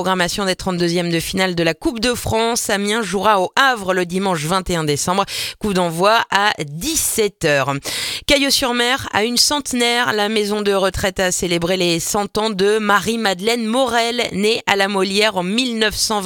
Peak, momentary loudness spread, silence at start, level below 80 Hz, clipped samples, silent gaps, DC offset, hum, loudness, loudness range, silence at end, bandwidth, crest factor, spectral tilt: 0 dBFS; 5 LU; 0 s; -42 dBFS; under 0.1%; none; under 0.1%; none; -17 LUFS; 2 LU; 0 s; 19 kHz; 18 dB; -3 dB/octave